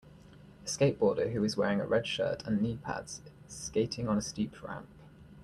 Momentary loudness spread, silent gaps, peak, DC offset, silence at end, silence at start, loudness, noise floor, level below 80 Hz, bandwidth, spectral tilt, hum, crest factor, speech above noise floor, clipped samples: 15 LU; none; -14 dBFS; under 0.1%; 0 s; 0.05 s; -32 LUFS; -54 dBFS; -60 dBFS; 12.5 kHz; -5 dB/octave; none; 18 dB; 22 dB; under 0.1%